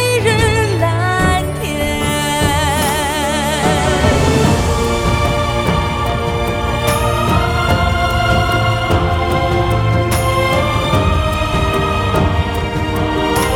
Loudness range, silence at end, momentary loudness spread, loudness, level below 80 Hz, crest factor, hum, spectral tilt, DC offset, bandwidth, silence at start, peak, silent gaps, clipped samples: 1 LU; 0 s; 4 LU; -15 LUFS; -24 dBFS; 14 dB; none; -5 dB/octave; under 0.1%; 18.5 kHz; 0 s; 0 dBFS; none; under 0.1%